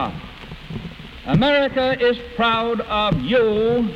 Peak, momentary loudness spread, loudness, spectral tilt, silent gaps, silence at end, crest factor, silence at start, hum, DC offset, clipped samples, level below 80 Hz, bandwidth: -6 dBFS; 18 LU; -19 LUFS; -7 dB/octave; none; 0 s; 14 dB; 0 s; none; under 0.1%; under 0.1%; -40 dBFS; 8.4 kHz